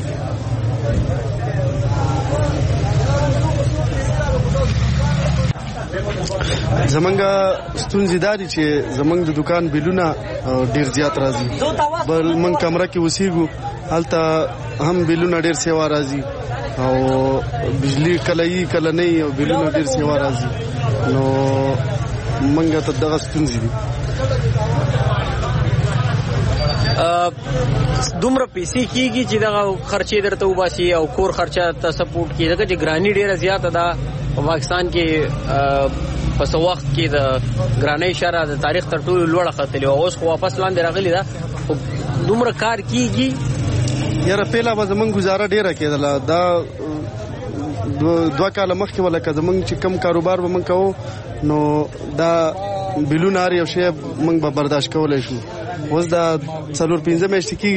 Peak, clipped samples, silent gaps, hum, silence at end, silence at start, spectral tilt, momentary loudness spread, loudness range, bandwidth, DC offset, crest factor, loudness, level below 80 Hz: -6 dBFS; under 0.1%; none; none; 0 s; 0 s; -6 dB/octave; 6 LU; 1 LU; 8.8 kHz; under 0.1%; 12 dB; -18 LUFS; -32 dBFS